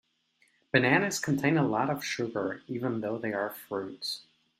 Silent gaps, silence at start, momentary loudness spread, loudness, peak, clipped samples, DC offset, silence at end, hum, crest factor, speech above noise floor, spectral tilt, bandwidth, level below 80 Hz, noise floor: none; 0.75 s; 11 LU; -29 LUFS; -8 dBFS; under 0.1%; under 0.1%; 0.4 s; none; 24 dB; 41 dB; -5 dB/octave; 16 kHz; -70 dBFS; -70 dBFS